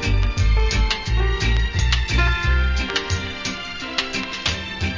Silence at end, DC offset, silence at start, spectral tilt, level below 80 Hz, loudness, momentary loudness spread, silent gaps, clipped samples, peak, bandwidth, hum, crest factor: 0 s; under 0.1%; 0 s; -4 dB/octave; -22 dBFS; -21 LUFS; 6 LU; none; under 0.1%; -6 dBFS; 7.6 kHz; none; 14 dB